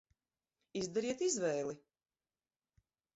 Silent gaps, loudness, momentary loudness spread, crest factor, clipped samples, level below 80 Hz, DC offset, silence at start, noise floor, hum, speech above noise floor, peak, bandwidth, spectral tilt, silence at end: none; -38 LUFS; 11 LU; 18 dB; under 0.1%; -78 dBFS; under 0.1%; 0.75 s; under -90 dBFS; none; over 53 dB; -24 dBFS; 8 kHz; -4.5 dB/octave; 1.35 s